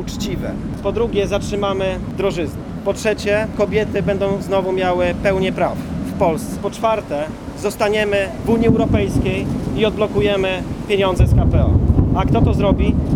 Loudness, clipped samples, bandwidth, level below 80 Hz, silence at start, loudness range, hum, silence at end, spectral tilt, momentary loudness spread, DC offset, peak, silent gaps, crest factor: -18 LUFS; under 0.1%; 16.5 kHz; -28 dBFS; 0 s; 3 LU; none; 0 s; -7 dB/octave; 9 LU; under 0.1%; 0 dBFS; none; 16 dB